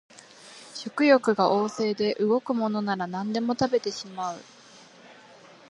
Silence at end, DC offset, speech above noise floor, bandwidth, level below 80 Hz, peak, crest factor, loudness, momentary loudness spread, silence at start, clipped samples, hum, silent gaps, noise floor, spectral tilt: 0.6 s; under 0.1%; 26 dB; 11 kHz; -68 dBFS; -6 dBFS; 22 dB; -25 LUFS; 17 LU; 0.45 s; under 0.1%; none; none; -51 dBFS; -5 dB/octave